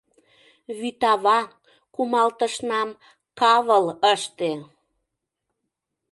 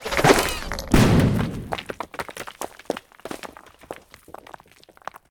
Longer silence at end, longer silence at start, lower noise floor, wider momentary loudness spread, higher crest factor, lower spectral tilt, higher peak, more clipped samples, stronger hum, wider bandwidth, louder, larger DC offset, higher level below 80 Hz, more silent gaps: first, 1.5 s vs 0.15 s; first, 0.7 s vs 0 s; first, -81 dBFS vs -52 dBFS; second, 14 LU vs 24 LU; about the same, 20 dB vs 22 dB; second, -3 dB/octave vs -5 dB/octave; second, -4 dBFS vs 0 dBFS; neither; neither; second, 11.5 kHz vs 19.5 kHz; about the same, -22 LUFS vs -22 LUFS; neither; second, -72 dBFS vs -36 dBFS; neither